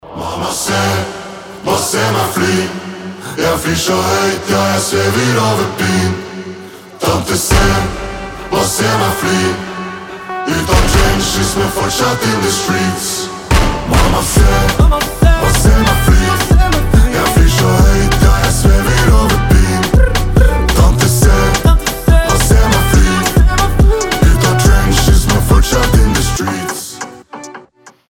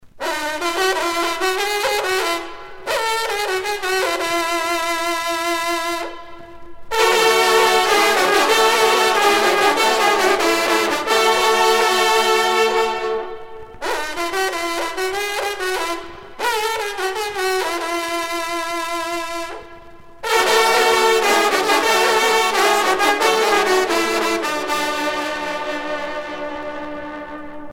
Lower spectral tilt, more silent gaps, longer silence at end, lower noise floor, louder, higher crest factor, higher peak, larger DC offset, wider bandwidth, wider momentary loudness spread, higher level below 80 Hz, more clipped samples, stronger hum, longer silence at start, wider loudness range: first, -4.5 dB/octave vs -1 dB/octave; neither; first, 0.2 s vs 0 s; about the same, -42 dBFS vs -39 dBFS; first, -12 LUFS vs -17 LUFS; second, 10 dB vs 18 dB; about the same, 0 dBFS vs 0 dBFS; neither; about the same, 17.5 kHz vs 19 kHz; about the same, 13 LU vs 13 LU; first, -14 dBFS vs -50 dBFS; neither; neither; about the same, 0.05 s vs 0.05 s; second, 4 LU vs 8 LU